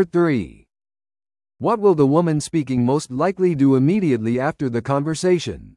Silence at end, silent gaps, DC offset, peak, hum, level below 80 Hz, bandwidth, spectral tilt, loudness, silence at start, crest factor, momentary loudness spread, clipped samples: 0.05 s; none; under 0.1%; -4 dBFS; none; -52 dBFS; 11.5 kHz; -7 dB/octave; -19 LUFS; 0 s; 16 dB; 6 LU; under 0.1%